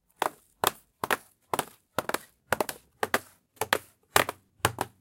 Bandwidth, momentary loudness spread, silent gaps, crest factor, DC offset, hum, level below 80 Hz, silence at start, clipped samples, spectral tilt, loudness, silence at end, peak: 17 kHz; 9 LU; none; 30 dB; under 0.1%; none; -62 dBFS; 0.2 s; under 0.1%; -2.5 dB/octave; -31 LUFS; 0.15 s; -2 dBFS